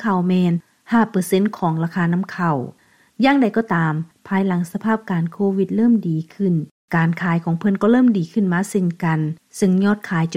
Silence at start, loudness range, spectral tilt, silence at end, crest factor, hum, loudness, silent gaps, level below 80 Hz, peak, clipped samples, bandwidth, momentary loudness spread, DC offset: 0 s; 2 LU; -7.5 dB/octave; 0 s; 16 dB; none; -19 LUFS; 6.71-6.88 s; -60 dBFS; -4 dBFS; under 0.1%; 14.5 kHz; 7 LU; 0.1%